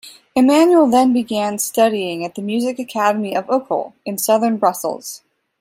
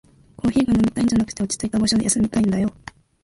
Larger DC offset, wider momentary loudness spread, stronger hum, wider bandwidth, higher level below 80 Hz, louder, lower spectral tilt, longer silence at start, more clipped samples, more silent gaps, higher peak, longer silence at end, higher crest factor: neither; first, 13 LU vs 6 LU; neither; first, 16 kHz vs 11.5 kHz; second, -62 dBFS vs -42 dBFS; first, -17 LUFS vs -20 LUFS; about the same, -4 dB/octave vs -4.5 dB/octave; second, 0.05 s vs 0.45 s; neither; neither; first, -2 dBFS vs -6 dBFS; about the same, 0.45 s vs 0.5 s; about the same, 16 dB vs 14 dB